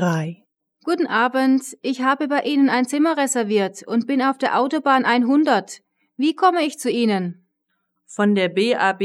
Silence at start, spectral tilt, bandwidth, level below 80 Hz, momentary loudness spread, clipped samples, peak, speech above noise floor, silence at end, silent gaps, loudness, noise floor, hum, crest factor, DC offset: 0 s; -5 dB/octave; 13.5 kHz; -82 dBFS; 8 LU; under 0.1%; -4 dBFS; 54 dB; 0 s; none; -19 LUFS; -73 dBFS; none; 16 dB; under 0.1%